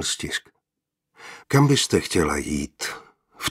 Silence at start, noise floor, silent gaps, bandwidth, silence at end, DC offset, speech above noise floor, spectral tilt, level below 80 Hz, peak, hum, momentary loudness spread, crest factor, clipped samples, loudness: 0 s; -84 dBFS; none; 16 kHz; 0 s; under 0.1%; 62 dB; -4.5 dB/octave; -46 dBFS; -4 dBFS; none; 19 LU; 20 dB; under 0.1%; -23 LUFS